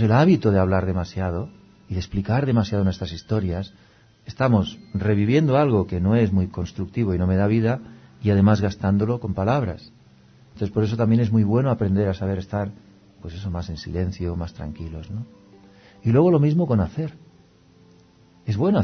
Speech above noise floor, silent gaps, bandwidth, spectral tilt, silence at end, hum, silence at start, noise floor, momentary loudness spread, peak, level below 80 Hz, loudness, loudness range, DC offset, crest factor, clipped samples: 33 dB; none; 6.4 kHz; -8.5 dB/octave; 0 s; none; 0 s; -54 dBFS; 15 LU; -4 dBFS; -44 dBFS; -22 LUFS; 5 LU; under 0.1%; 18 dB; under 0.1%